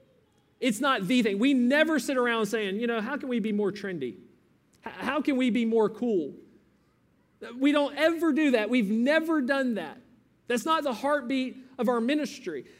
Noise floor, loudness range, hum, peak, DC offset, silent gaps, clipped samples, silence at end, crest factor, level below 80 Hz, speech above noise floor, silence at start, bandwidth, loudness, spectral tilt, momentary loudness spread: -66 dBFS; 4 LU; none; -10 dBFS; under 0.1%; none; under 0.1%; 0.15 s; 18 dB; -74 dBFS; 40 dB; 0.6 s; 16 kHz; -27 LUFS; -5 dB/octave; 11 LU